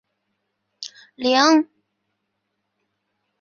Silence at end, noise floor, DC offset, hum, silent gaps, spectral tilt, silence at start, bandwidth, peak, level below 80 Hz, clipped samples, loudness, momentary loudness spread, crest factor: 1.75 s; -76 dBFS; under 0.1%; none; none; -1.5 dB/octave; 0.8 s; 7.2 kHz; -2 dBFS; -74 dBFS; under 0.1%; -17 LUFS; 21 LU; 22 dB